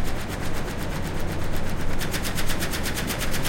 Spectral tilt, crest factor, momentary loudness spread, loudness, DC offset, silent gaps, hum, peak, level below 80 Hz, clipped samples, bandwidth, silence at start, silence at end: -4 dB/octave; 14 dB; 4 LU; -29 LUFS; under 0.1%; none; none; -10 dBFS; -30 dBFS; under 0.1%; 17 kHz; 0 s; 0 s